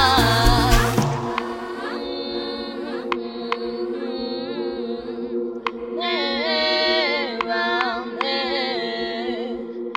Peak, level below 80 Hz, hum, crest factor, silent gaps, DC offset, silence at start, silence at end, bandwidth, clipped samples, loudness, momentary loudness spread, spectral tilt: -2 dBFS; -32 dBFS; none; 20 dB; none; under 0.1%; 0 s; 0 s; 17 kHz; under 0.1%; -23 LUFS; 11 LU; -4.5 dB/octave